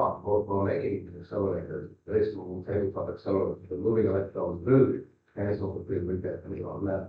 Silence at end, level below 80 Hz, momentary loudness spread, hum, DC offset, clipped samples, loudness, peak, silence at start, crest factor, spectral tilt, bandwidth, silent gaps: 0 s; -58 dBFS; 12 LU; none; under 0.1%; under 0.1%; -30 LUFS; -10 dBFS; 0 s; 18 dB; -11.5 dB/octave; 5.2 kHz; none